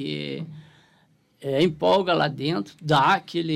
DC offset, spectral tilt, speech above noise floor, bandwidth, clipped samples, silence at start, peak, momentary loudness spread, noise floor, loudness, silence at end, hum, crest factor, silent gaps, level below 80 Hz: under 0.1%; -6 dB/octave; 39 dB; 13.5 kHz; under 0.1%; 0 s; -8 dBFS; 15 LU; -62 dBFS; -23 LUFS; 0 s; none; 16 dB; none; -62 dBFS